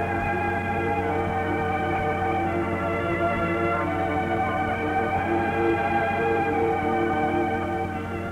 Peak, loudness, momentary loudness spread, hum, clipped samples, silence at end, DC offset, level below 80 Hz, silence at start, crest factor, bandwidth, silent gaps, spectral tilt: -12 dBFS; -25 LUFS; 3 LU; none; under 0.1%; 0 s; under 0.1%; -46 dBFS; 0 s; 12 dB; 15 kHz; none; -7.5 dB/octave